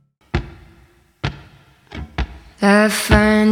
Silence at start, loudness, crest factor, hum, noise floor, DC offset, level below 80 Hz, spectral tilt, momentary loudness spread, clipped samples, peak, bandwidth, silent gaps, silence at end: 0.35 s; -17 LUFS; 18 dB; none; -52 dBFS; under 0.1%; -30 dBFS; -5 dB/octave; 17 LU; under 0.1%; 0 dBFS; 16.5 kHz; none; 0 s